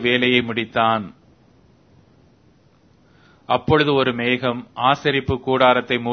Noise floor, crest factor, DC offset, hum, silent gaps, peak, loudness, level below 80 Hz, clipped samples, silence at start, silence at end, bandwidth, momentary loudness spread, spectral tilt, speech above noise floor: -55 dBFS; 20 dB; under 0.1%; none; none; 0 dBFS; -19 LUFS; -48 dBFS; under 0.1%; 0 s; 0 s; 6.6 kHz; 7 LU; -6.5 dB/octave; 36 dB